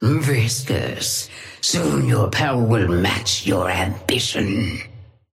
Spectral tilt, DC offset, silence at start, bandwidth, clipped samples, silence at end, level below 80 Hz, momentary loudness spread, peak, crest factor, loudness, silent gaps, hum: -4.5 dB/octave; under 0.1%; 0 s; 16 kHz; under 0.1%; 0.3 s; -44 dBFS; 6 LU; -4 dBFS; 16 dB; -20 LUFS; none; none